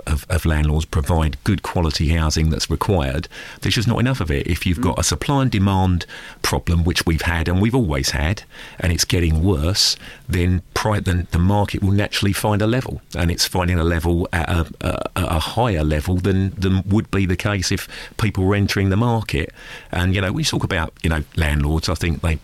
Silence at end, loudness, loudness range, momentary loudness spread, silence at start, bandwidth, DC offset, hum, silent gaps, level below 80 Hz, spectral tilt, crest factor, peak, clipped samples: 0 s; -20 LUFS; 1 LU; 6 LU; 0.05 s; 15.5 kHz; under 0.1%; none; none; -28 dBFS; -5 dB/octave; 14 dB; -6 dBFS; under 0.1%